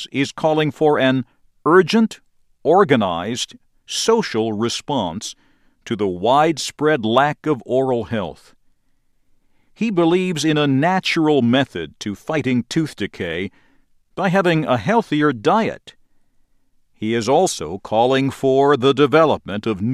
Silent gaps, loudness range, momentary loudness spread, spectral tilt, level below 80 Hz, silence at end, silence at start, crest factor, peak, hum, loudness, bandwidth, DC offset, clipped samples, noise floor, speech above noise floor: none; 4 LU; 11 LU; -5 dB/octave; -56 dBFS; 0 s; 0 s; 18 dB; 0 dBFS; none; -18 LUFS; 14 kHz; under 0.1%; under 0.1%; -60 dBFS; 42 dB